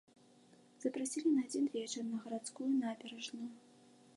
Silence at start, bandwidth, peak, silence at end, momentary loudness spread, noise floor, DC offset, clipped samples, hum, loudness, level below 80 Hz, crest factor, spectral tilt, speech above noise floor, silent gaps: 0.8 s; 11.5 kHz; -24 dBFS; 0.55 s; 11 LU; -65 dBFS; under 0.1%; under 0.1%; none; -39 LUFS; under -90 dBFS; 16 dB; -3.5 dB/octave; 27 dB; none